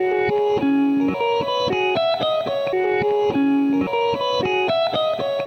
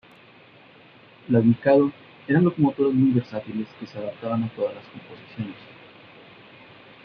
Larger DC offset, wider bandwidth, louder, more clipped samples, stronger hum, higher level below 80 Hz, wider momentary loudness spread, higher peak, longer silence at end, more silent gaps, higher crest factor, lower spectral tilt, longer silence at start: neither; first, 6.6 kHz vs 5.4 kHz; first, -20 LUFS vs -23 LUFS; neither; neither; first, -56 dBFS vs -64 dBFS; second, 3 LU vs 22 LU; second, -10 dBFS vs -6 dBFS; second, 0 s vs 1.4 s; neither; second, 10 dB vs 18 dB; second, -6 dB/octave vs -10.5 dB/octave; second, 0 s vs 1.3 s